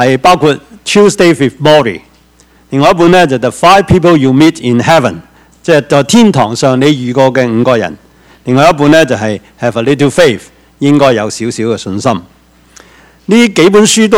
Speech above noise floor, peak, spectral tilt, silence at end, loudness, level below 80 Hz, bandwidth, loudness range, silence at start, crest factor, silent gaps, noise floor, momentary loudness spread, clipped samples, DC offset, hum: 37 dB; 0 dBFS; -5 dB/octave; 0 s; -8 LUFS; -40 dBFS; 16.5 kHz; 3 LU; 0 s; 8 dB; none; -44 dBFS; 10 LU; 3%; under 0.1%; none